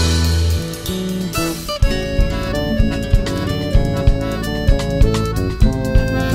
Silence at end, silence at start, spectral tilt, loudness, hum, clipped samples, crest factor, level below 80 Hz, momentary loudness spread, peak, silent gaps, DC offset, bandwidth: 0 s; 0 s; -5.5 dB/octave; -18 LUFS; none; under 0.1%; 16 dB; -20 dBFS; 5 LU; 0 dBFS; none; under 0.1%; 16.5 kHz